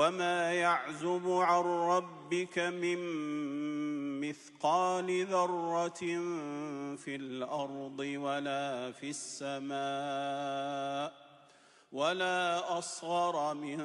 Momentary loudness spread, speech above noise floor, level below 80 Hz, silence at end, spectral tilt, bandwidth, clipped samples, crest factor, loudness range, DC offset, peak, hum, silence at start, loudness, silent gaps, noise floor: 10 LU; 29 dB; -86 dBFS; 0 s; -4 dB/octave; 11.5 kHz; under 0.1%; 18 dB; 6 LU; under 0.1%; -16 dBFS; none; 0 s; -34 LUFS; none; -62 dBFS